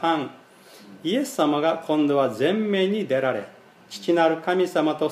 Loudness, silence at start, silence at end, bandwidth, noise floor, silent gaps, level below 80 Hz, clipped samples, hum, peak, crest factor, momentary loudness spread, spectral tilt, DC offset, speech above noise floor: -23 LUFS; 0 s; 0 s; 15 kHz; -48 dBFS; none; -78 dBFS; under 0.1%; none; -6 dBFS; 16 dB; 12 LU; -5.5 dB/octave; under 0.1%; 26 dB